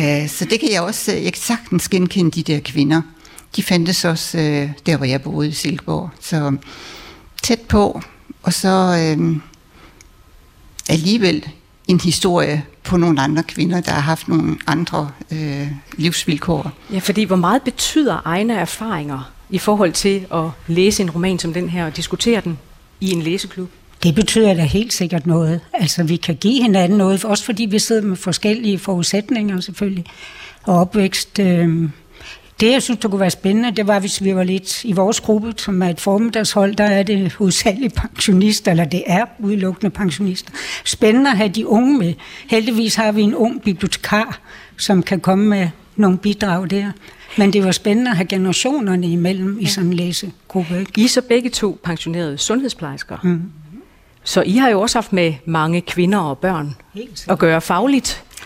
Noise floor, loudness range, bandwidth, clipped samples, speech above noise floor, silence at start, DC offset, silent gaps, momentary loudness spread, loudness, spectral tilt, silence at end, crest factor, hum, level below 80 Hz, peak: -46 dBFS; 3 LU; 16 kHz; under 0.1%; 30 dB; 0 s; under 0.1%; none; 10 LU; -17 LUFS; -5 dB/octave; 0 s; 14 dB; none; -44 dBFS; -2 dBFS